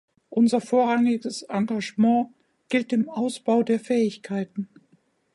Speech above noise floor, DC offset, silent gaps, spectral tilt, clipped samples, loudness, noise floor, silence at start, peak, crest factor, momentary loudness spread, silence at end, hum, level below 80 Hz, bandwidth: 41 dB; under 0.1%; none; -6 dB/octave; under 0.1%; -24 LUFS; -64 dBFS; 0.3 s; -8 dBFS; 16 dB; 9 LU; 0.7 s; none; -76 dBFS; 11.5 kHz